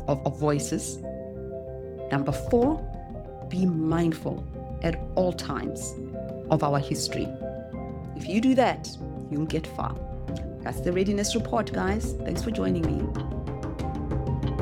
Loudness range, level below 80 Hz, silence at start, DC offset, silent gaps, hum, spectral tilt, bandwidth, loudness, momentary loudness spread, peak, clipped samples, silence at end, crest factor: 2 LU; -40 dBFS; 0 s; under 0.1%; none; none; -6 dB/octave; 17 kHz; -28 LUFS; 12 LU; -8 dBFS; under 0.1%; 0 s; 20 dB